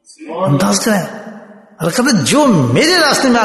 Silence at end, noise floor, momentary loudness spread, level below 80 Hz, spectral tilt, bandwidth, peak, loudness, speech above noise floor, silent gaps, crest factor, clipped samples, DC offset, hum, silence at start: 0 s; -36 dBFS; 17 LU; -50 dBFS; -4 dB/octave; 12.5 kHz; 0 dBFS; -12 LUFS; 24 dB; none; 12 dB; under 0.1%; under 0.1%; none; 0.2 s